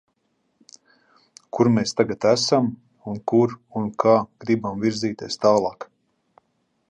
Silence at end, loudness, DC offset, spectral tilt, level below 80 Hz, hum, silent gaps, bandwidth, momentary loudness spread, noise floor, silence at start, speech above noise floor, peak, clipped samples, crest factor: 1.05 s; -21 LUFS; under 0.1%; -5.5 dB/octave; -62 dBFS; none; none; 10 kHz; 13 LU; -70 dBFS; 1.55 s; 50 dB; -4 dBFS; under 0.1%; 20 dB